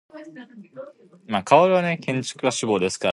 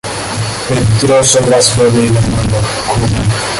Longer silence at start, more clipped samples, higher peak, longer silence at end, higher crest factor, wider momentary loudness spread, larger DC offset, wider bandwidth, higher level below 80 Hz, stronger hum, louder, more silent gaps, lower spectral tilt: about the same, 0.15 s vs 0.05 s; neither; about the same, -2 dBFS vs 0 dBFS; about the same, 0 s vs 0 s; first, 22 dB vs 10 dB; first, 25 LU vs 9 LU; neither; about the same, 11.5 kHz vs 11.5 kHz; second, -62 dBFS vs -28 dBFS; neither; second, -21 LUFS vs -11 LUFS; neither; about the same, -4.5 dB/octave vs -4.5 dB/octave